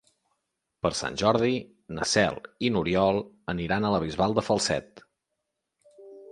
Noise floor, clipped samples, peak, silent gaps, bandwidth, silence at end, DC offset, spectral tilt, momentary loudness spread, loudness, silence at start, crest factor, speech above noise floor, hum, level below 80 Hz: -82 dBFS; under 0.1%; -6 dBFS; none; 11.5 kHz; 0 s; under 0.1%; -4.5 dB/octave; 8 LU; -26 LUFS; 0.85 s; 22 dB; 56 dB; none; -52 dBFS